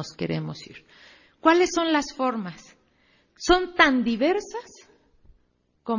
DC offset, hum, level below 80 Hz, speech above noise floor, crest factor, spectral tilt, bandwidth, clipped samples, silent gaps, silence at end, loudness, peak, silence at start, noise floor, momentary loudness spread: under 0.1%; none; -50 dBFS; 44 dB; 24 dB; -4 dB/octave; 7.4 kHz; under 0.1%; none; 0 s; -23 LUFS; -2 dBFS; 0 s; -68 dBFS; 19 LU